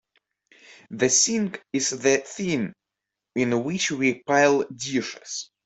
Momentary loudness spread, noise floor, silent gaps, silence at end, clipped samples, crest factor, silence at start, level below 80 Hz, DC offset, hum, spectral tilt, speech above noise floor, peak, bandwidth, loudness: 14 LU; -85 dBFS; none; 0.2 s; under 0.1%; 20 dB; 0.7 s; -66 dBFS; under 0.1%; none; -3 dB/octave; 62 dB; -4 dBFS; 8.4 kHz; -23 LUFS